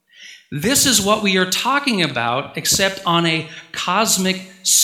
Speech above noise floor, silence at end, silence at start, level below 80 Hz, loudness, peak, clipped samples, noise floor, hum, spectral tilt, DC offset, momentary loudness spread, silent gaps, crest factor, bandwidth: 25 dB; 0 s; 0.2 s; -50 dBFS; -17 LUFS; 0 dBFS; under 0.1%; -43 dBFS; none; -2 dB/octave; under 0.1%; 9 LU; none; 18 dB; 18 kHz